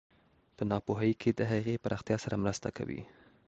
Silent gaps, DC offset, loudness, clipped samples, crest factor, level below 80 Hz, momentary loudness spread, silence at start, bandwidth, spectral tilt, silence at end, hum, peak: none; under 0.1%; -34 LUFS; under 0.1%; 18 dB; -58 dBFS; 9 LU; 0.6 s; 8.2 kHz; -6.5 dB/octave; 0.4 s; none; -16 dBFS